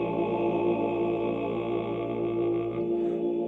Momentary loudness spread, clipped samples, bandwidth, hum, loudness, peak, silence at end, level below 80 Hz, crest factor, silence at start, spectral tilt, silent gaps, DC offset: 4 LU; under 0.1%; 4 kHz; none; -28 LUFS; -16 dBFS; 0 s; -56 dBFS; 12 dB; 0 s; -9.5 dB/octave; none; under 0.1%